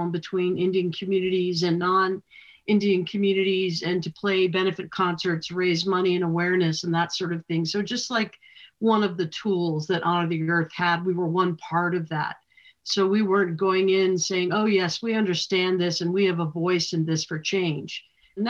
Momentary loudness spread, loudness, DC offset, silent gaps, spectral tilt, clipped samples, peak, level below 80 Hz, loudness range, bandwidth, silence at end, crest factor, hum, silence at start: 6 LU; -24 LUFS; under 0.1%; none; -5 dB/octave; under 0.1%; -8 dBFS; -70 dBFS; 2 LU; 7.6 kHz; 0 s; 16 dB; none; 0 s